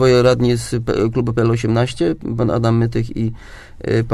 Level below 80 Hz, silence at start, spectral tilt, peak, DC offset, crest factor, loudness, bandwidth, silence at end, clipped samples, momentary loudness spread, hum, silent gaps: -38 dBFS; 0 s; -7 dB/octave; 0 dBFS; under 0.1%; 16 dB; -17 LUFS; 12.5 kHz; 0 s; under 0.1%; 9 LU; none; none